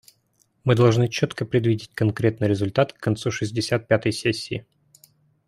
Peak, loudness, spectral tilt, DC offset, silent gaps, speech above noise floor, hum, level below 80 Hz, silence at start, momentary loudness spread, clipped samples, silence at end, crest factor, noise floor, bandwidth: -4 dBFS; -23 LUFS; -6.5 dB/octave; under 0.1%; none; 44 dB; none; -56 dBFS; 0.65 s; 7 LU; under 0.1%; 0.85 s; 20 dB; -66 dBFS; 12.5 kHz